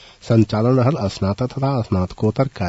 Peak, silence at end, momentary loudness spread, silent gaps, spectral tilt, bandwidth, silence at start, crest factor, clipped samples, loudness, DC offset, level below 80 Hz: -2 dBFS; 0 s; 6 LU; none; -8 dB/octave; 8 kHz; 0.25 s; 16 dB; under 0.1%; -19 LUFS; under 0.1%; -48 dBFS